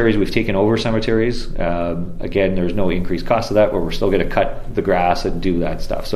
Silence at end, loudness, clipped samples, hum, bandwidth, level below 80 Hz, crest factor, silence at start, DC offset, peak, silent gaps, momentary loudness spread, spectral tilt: 0 s; -19 LUFS; under 0.1%; none; 13 kHz; -26 dBFS; 16 dB; 0 s; under 0.1%; -2 dBFS; none; 6 LU; -6.5 dB/octave